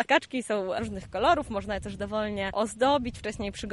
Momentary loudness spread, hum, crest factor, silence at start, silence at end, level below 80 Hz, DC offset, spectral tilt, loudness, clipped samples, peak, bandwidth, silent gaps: 9 LU; none; 20 dB; 0 s; 0 s; -48 dBFS; under 0.1%; -4.5 dB/octave; -29 LUFS; under 0.1%; -8 dBFS; 11.5 kHz; none